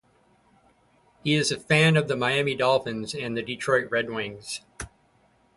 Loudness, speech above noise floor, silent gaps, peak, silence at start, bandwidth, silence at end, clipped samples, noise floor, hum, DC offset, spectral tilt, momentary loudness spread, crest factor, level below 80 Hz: -25 LUFS; 38 dB; none; -6 dBFS; 1.25 s; 11.5 kHz; 0.7 s; under 0.1%; -63 dBFS; none; under 0.1%; -4.5 dB/octave; 15 LU; 20 dB; -58 dBFS